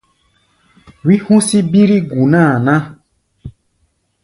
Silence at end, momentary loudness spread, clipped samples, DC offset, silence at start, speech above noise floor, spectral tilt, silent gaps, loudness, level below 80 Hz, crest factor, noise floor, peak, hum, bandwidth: 0.75 s; 6 LU; under 0.1%; under 0.1%; 1.05 s; 51 dB; -6.5 dB/octave; none; -12 LUFS; -50 dBFS; 14 dB; -62 dBFS; 0 dBFS; none; 11.5 kHz